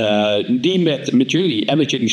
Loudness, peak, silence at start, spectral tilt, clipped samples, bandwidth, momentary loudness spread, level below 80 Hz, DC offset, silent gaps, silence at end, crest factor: -17 LUFS; -4 dBFS; 0 s; -5 dB/octave; under 0.1%; 10 kHz; 1 LU; -74 dBFS; under 0.1%; none; 0 s; 14 dB